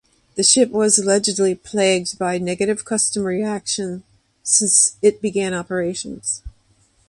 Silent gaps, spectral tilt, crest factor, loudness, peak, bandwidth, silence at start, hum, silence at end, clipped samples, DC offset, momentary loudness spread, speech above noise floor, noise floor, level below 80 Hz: none; -2.5 dB/octave; 18 dB; -18 LUFS; 0 dBFS; 11.5 kHz; 0.35 s; none; 0.6 s; under 0.1%; under 0.1%; 12 LU; 40 dB; -59 dBFS; -50 dBFS